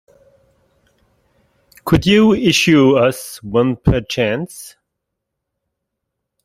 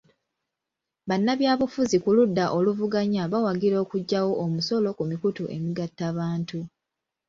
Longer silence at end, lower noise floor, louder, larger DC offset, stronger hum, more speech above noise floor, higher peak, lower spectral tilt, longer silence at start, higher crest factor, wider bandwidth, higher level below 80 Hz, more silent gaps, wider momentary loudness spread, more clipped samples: first, 1.75 s vs 0.6 s; second, -78 dBFS vs -86 dBFS; first, -14 LUFS vs -25 LUFS; neither; neither; about the same, 64 dB vs 62 dB; first, 0 dBFS vs -10 dBFS; about the same, -5.5 dB/octave vs -6.5 dB/octave; first, 1.85 s vs 1.05 s; about the same, 16 dB vs 16 dB; first, 15.5 kHz vs 7.6 kHz; first, -38 dBFS vs -64 dBFS; neither; first, 17 LU vs 9 LU; neither